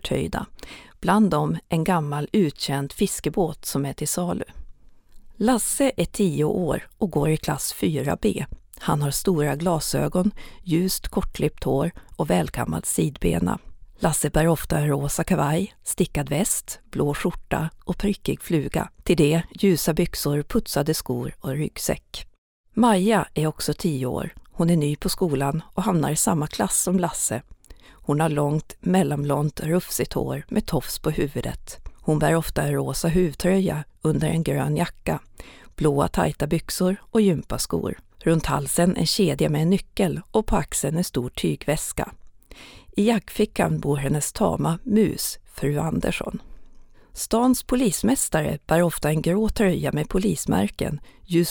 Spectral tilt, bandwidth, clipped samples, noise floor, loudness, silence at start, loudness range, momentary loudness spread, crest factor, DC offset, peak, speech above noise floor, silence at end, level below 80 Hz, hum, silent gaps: -5.5 dB/octave; over 20 kHz; under 0.1%; -46 dBFS; -23 LUFS; 0.05 s; 3 LU; 8 LU; 18 dB; under 0.1%; -4 dBFS; 23 dB; 0 s; -40 dBFS; none; 22.38-22.64 s